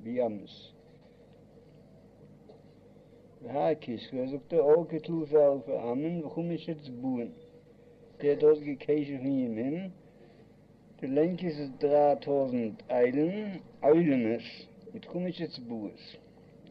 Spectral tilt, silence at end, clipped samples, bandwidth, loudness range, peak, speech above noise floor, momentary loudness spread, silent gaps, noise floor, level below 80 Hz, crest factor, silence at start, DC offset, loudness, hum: -9.5 dB/octave; 0 s; under 0.1%; 5.6 kHz; 7 LU; -12 dBFS; 28 dB; 18 LU; none; -57 dBFS; -70 dBFS; 20 dB; 0 s; under 0.1%; -30 LUFS; none